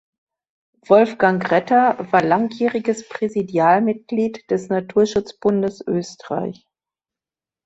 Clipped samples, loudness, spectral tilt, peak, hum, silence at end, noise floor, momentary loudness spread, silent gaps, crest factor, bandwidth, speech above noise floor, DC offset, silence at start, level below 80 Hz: under 0.1%; -19 LUFS; -6.5 dB/octave; -2 dBFS; none; 1.15 s; under -90 dBFS; 9 LU; none; 18 dB; 8 kHz; over 72 dB; under 0.1%; 0.9 s; -60 dBFS